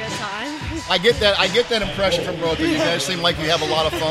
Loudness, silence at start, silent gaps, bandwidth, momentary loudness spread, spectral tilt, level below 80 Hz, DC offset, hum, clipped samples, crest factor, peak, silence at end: -19 LUFS; 0 s; none; 15 kHz; 10 LU; -3.5 dB/octave; -40 dBFS; under 0.1%; none; under 0.1%; 18 dB; -2 dBFS; 0 s